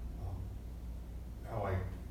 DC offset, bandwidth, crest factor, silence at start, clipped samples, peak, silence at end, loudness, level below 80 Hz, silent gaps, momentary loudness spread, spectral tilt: under 0.1%; 15.5 kHz; 16 dB; 0 s; under 0.1%; -26 dBFS; 0 s; -43 LUFS; -46 dBFS; none; 9 LU; -8 dB/octave